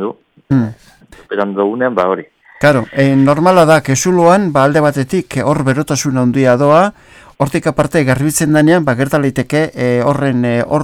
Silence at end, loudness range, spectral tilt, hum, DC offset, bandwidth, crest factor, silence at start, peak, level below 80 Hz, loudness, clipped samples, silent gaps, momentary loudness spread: 0 s; 3 LU; -6 dB/octave; none; under 0.1%; 17.5 kHz; 12 dB; 0 s; 0 dBFS; -44 dBFS; -12 LUFS; under 0.1%; none; 8 LU